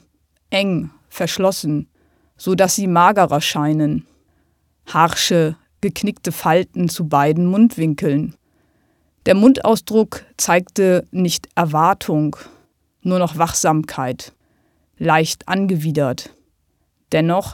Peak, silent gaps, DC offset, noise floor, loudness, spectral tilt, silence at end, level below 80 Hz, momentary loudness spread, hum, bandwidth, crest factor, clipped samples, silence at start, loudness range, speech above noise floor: 0 dBFS; none; under 0.1%; -65 dBFS; -17 LUFS; -5 dB/octave; 0 s; -52 dBFS; 11 LU; none; 18 kHz; 18 dB; under 0.1%; 0.5 s; 4 LU; 49 dB